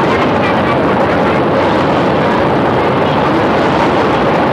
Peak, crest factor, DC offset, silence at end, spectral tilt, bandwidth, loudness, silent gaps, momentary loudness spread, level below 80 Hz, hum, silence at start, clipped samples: -2 dBFS; 8 dB; under 0.1%; 0 s; -7 dB/octave; 13 kHz; -11 LUFS; none; 1 LU; -36 dBFS; none; 0 s; under 0.1%